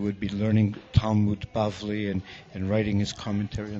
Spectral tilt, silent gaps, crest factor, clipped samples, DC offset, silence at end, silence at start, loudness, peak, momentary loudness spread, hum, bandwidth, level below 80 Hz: -7 dB/octave; none; 20 dB; under 0.1%; under 0.1%; 0 s; 0 s; -27 LUFS; -6 dBFS; 7 LU; none; 7.8 kHz; -44 dBFS